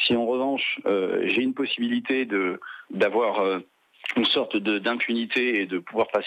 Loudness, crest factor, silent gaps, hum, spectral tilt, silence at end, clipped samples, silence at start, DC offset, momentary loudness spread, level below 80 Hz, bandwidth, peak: -24 LUFS; 14 dB; none; none; -5.5 dB/octave; 0 s; under 0.1%; 0 s; under 0.1%; 6 LU; -74 dBFS; 9 kHz; -10 dBFS